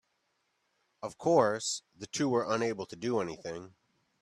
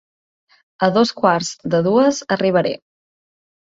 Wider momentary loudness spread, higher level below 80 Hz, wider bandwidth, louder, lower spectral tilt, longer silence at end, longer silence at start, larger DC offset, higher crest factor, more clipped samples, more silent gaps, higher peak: first, 16 LU vs 6 LU; second, -72 dBFS vs -60 dBFS; first, 12.5 kHz vs 8 kHz; second, -31 LUFS vs -17 LUFS; about the same, -4.5 dB/octave vs -5 dB/octave; second, 0.55 s vs 1 s; first, 1 s vs 0.8 s; neither; about the same, 22 dB vs 18 dB; neither; neither; second, -10 dBFS vs -2 dBFS